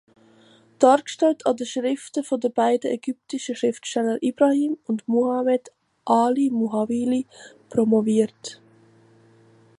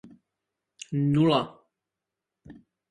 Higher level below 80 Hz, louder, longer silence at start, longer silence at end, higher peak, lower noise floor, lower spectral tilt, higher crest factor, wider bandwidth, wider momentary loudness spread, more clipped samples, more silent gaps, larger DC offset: second, -70 dBFS vs -64 dBFS; first, -22 LUFS vs -25 LUFS; first, 0.8 s vs 0.05 s; first, 1.25 s vs 0.4 s; first, -2 dBFS vs -8 dBFS; second, -54 dBFS vs -87 dBFS; second, -5 dB/octave vs -7 dB/octave; about the same, 20 dB vs 22 dB; first, 11.5 kHz vs 10 kHz; second, 9 LU vs 18 LU; neither; neither; neither